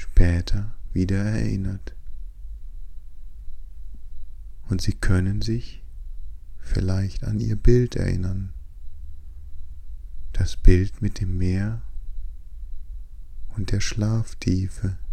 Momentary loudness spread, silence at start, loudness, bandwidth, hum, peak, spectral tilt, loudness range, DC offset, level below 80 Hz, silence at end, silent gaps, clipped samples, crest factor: 23 LU; 0 s; -25 LUFS; 9.2 kHz; none; 0 dBFS; -7 dB/octave; 5 LU; under 0.1%; -26 dBFS; 0 s; none; under 0.1%; 22 dB